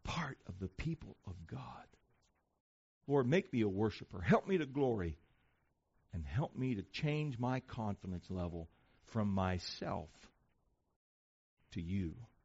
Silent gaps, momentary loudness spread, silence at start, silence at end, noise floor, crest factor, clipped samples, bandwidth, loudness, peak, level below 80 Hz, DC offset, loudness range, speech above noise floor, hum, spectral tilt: 2.60-3.01 s, 10.96-11.57 s; 16 LU; 0.05 s; 0.2 s; -79 dBFS; 24 dB; under 0.1%; 7.6 kHz; -39 LUFS; -16 dBFS; -58 dBFS; under 0.1%; 7 LU; 41 dB; none; -6 dB/octave